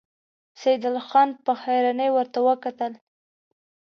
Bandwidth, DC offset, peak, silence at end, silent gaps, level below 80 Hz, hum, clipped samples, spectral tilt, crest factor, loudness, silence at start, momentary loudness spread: 6.6 kHz; under 0.1%; -6 dBFS; 1 s; none; -82 dBFS; none; under 0.1%; -4.5 dB/octave; 18 dB; -23 LUFS; 0.6 s; 8 LU